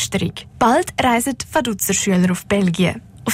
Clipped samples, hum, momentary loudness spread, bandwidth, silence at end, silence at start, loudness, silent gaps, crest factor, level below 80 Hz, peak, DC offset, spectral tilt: under 0.1%; none; 5 LU; 16 kHz; 0 s; 0 s; -18 LUFS; none; 14 dB; -44 dBFS; -4 dBFS; under 0.1%; -4.5 dB/octave